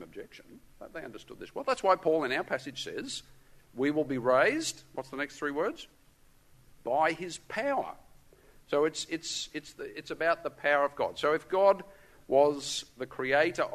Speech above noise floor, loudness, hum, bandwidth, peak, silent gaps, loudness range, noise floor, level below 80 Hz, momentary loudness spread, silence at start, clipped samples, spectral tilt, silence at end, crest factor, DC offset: 30 dB; -30 LUFS; none; 13.5 kHz; -10 dBFS; none; 5 LU; -61 dBFS; -64 dBFS; 18 LU; 0 s; under 0.1%; -3.5 dB/octave; 0 s; 20 dB; under 0.1%